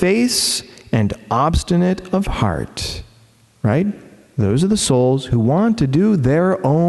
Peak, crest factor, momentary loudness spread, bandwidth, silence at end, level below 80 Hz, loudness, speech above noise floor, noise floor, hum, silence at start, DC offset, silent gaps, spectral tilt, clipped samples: 0 dBFS; 16 dB; 9 LU; 12.5 kHz; 0 s; -34 dBFS; -17 LUFS; 35 dB; -51 dBFS; none; 0 s; under 0.1%; none; -5.5 dB/octave; under 0.1%